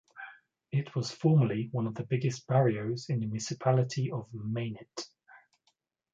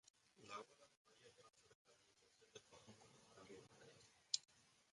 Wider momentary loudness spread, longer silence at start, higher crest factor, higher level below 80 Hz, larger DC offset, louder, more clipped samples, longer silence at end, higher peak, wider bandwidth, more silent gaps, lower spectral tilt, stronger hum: second, 16 LU vs 22 LU; about the same, 0.15 s vs 0.05 s; second, 18 dB vs 38 dB; first, -70 dBFS vs under -90 dBFS; neither; first, -31 LUFS vs -52 LUFS; neither; first, 0.75 s vs 0 s; first, -12 dBFS vs -20 dBFS; second, 7.8 kHz vs 11 kHz; second, none vs 0.10-0.14 s, 0.97-1.05 s, 1.75-1.85 s; first, -6.5 dB/octave vs -0.5 dB/octave; neither